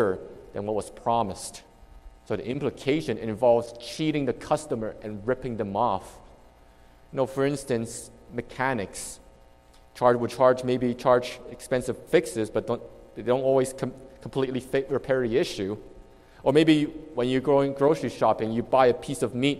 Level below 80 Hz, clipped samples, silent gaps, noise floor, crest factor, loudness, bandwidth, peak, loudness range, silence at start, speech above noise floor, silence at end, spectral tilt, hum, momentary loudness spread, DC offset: -54 dBFS; under 0.1%; none; -54 dBFS; 20 dB; -26 LUFS; 14.5 kHz; -6 dBFS; 6 LU; 0 s; 29 dB; 0 s; -5.5 dB/octave; none; 14 LU; under 0.1%